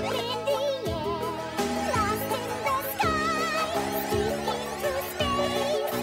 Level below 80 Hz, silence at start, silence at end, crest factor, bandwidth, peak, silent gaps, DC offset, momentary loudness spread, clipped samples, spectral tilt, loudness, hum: -48 dBFS; 0 s; 0 s; 16 dB; 16 kHz; -12 dBFS; none; under 0.1%; 4 LU; under 0.1%; -4 dB/octave; -28 LUFS; none